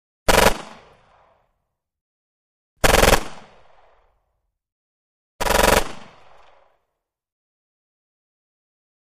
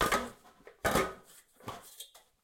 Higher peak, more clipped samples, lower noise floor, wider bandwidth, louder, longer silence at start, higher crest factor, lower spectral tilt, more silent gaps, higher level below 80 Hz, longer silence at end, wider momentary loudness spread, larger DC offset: first, 0 dBFS vs -16 dBFS; neither; first, -78 dBFS vs -58 dBFS; about the same, 15.5 kHz vs 17 kHz; first, -17 LUFS vs -34 LUFS; first, 0.3 s vs 0 s; about the same, 24 dB vs 20 dB; about the same, -3 dB/octave vs -3.5 dB/octave; first, 2.01-2.77 s, 4.72-5.39 s vs none; first, -32 dBFS vs -54 dBFS; first, 3.05 s vs 0.35 s; about the same, 18 LU vs 20 LU; neither